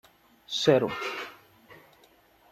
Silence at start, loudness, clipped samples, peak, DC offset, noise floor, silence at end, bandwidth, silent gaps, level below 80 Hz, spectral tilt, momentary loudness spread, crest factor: 0.5 s; -27 LUFS; under 0.1%; -8 dBFS; under 0.1%; -60 dBFS; 0.8 s; 14 kHz; none; -68 dBFS; -4.5 dB/octave; 15 LU; 24 dB